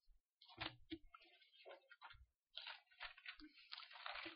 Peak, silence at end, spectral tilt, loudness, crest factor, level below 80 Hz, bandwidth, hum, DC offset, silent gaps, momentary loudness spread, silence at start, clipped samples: -30 dBFS; 0 s; -0.5 dB/octave; -56 LUFS; 28 dB; -76 dBFS; 5.4 kHz; none; under 0.1%; 0.29-0.37 s, 2.36-2.43 s; 14 LU; 0.05 s; under 0.1%